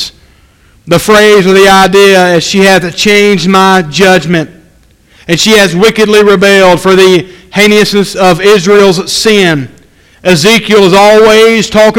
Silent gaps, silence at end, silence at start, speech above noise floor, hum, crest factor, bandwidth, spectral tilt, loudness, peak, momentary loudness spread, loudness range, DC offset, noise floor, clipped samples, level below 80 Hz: none; 0 s; 0 s; 38 dB; none; 6 dB; 17 kHz; -4 dB/octave; -5 LUFS; 0 dBFS; 8 LU; 2 LU; under 0.1%; -43 dBFS; 7%; -36 dBFS